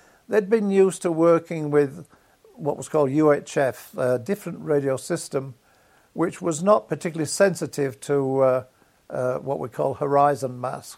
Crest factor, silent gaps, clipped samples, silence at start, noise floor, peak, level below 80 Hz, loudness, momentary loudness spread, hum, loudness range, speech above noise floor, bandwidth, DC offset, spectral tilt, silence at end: 18 dB; none; under 0.1%; 0.3 s; -58 dBFS; -4 dBFS; -68 dBFS; -23 LUFS; 10 LU; none; 3 LU; 36 dB; 16 kHz; under 0.1%; -6 dB/octave; 0 s